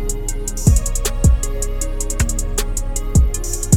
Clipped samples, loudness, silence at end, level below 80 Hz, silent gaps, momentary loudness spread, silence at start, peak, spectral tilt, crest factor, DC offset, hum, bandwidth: under 0.1%; -20 LUFS; 0 s; -18 dBFS; none; 8 LU; 0 s; 0 dBFS; -5 dB/octave; 16 dB; under 0.1%; none; 18 kHz